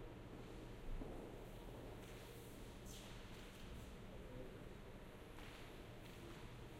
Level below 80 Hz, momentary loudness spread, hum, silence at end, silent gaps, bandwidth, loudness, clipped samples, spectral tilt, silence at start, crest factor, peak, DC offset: -58 dBFS; 3 LU; none; 0 s; none; 16 kHz; -56 LUFS; under 0.1%; -5 dB/octave; 0 s; 16 dB; -38 dBFS; under 0.1%